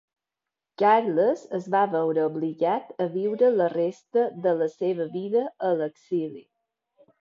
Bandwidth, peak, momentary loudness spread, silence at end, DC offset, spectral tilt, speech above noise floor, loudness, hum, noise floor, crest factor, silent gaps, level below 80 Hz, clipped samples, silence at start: 7.4 kHz; -8 dBFS; 9 LU; 0.8 s; under 0.1%; -7.5 dB/octave; 64 dB; -25 LUFS; none; -88 dBFS; 18 dB; none; -80 dBFS; under 0.1%; 0.8 s